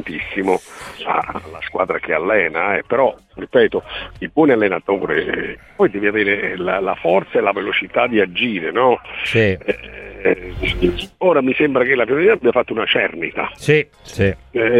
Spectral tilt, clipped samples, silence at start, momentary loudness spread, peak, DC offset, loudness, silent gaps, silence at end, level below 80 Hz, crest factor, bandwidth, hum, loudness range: -6 dB/octave; under 0.1%; 0 s; 9 LU; -2 dBFS; under 0.1%; -17 LUFS; none; 0 s; -40 dBFS; 16 dB; 12 kHz; none; 2 LU